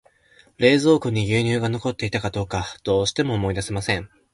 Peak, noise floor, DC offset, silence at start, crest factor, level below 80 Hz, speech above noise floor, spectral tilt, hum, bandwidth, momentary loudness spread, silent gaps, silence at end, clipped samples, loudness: -4 dBFS; -56 dBFS; under 0.1%; 0.6 s; 20 dB; -44 dBFS; 35 dB; -5.5 dB/octave; none; 11.5 kHz; 9 LU; none; 0.3 s; under 0.1%; -22 LUFS